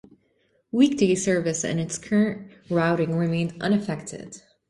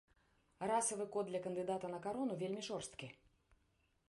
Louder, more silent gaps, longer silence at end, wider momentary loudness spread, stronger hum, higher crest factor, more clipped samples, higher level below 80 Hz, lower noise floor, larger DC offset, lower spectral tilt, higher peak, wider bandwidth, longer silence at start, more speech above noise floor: first, -24 LUFS vs -42 LUFS; neither; second, 0.3 s vs 0.95 s; first, 13 LU vs 10 LU; neither; about the same, 18 dB vs 18 dB; neither; first, -60 dBFS vs -78 dBFS; second, -67 dBFS vs -79 dBFS; neither; first, -5.5 dB/octave vs -4 dB/octave; first, -6 dBFS vs -26 dBFS; about the same, 11.5 kHz vs 11.5 kHz; first, 0.75 s vs 0.6 s; first, 44 dB vs 37 dB